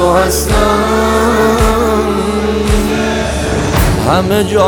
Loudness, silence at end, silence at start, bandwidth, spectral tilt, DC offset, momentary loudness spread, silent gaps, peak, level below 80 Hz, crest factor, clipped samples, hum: -12 LUFS; 0 s; 0 s; over 20 kHz; -5 dB/octave; under 0.1%; 4 LU; none; 0 dBFS; -20 dBFS; 10 dB; under 0.1%; none